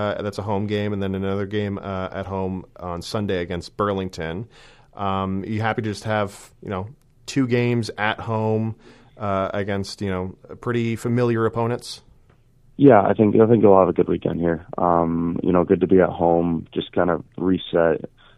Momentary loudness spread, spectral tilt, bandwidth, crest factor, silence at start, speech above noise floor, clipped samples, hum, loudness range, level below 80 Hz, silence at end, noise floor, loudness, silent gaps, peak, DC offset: 15 LU; -7.5 dB/octave; 12.5 kHz; 22 dB; 0 s; 33 dB; under 0.1%; none; 9 LU; -50 dBFS; 0.3 s; -54 dBFS; -21 LUFS; none; 0 dBFS; under 0.1%